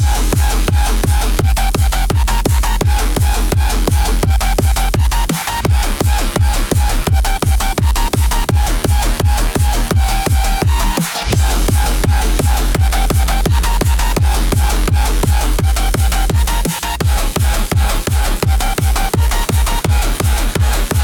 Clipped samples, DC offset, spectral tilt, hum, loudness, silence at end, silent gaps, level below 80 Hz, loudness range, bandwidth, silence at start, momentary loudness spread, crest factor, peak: under 0.1%; under 0.1%; -4.5 dB/octave; none; -15 LUFS; 0 s; none; -14 dBFS; 1 LU; 19 kHz; 0 s; 1 LU; 12 dB; 0 dBFS